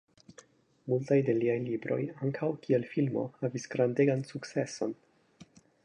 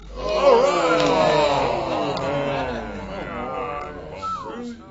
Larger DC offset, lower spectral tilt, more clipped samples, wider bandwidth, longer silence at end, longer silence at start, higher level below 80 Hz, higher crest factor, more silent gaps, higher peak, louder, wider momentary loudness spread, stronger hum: neither; first, -7 dB/octave vs -5 dB/octave; neither; first, 10.5 kHz vs 8 kHz; first, 0.4 s vs 0 s; first, 0.85 s vs 0 s; second, -76 dBFS vs -42 dBFS; about the same, 18 dB vs 18 dB; neither; second, -14 dBFS vs -2 dBFS; second, -31 LUFS vs -21 LUFS; second, 9 LU vs 15 LU; neither